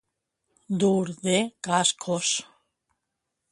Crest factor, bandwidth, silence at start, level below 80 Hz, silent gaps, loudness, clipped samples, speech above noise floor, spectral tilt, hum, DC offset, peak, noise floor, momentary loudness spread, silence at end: 20 dB; 11.5 kHz; 0.7 s; -70 dBFS; none; -25 LUFS; under 0.1%; 57 dB; -3.5 dB/octave; none; under 0.1%; -8 dBFS; -82 dBFS; 4 LU; 1.1 s